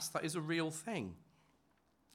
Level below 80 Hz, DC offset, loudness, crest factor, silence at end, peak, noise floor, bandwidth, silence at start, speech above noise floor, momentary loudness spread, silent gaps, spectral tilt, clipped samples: -80 dBFS; under 0.1%; -40 LUFS; 18 dB; 0.9 s; -24 dBFS; -75 dBFS; 16.5 kHz; 0 s; 35 dB; 11 LU; none; -4 dB/octave; under 0.1%